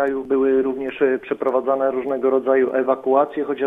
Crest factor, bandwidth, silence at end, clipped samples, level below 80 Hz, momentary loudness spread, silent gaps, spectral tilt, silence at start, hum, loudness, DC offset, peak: 16 dB; 3.8 kHz; 0 s; under 0.1%; -60 dBFS; 4 LU; none; -7.5 dB/octave; 0 s; none; -20 LUFS; under 0.1%; -4 dBFS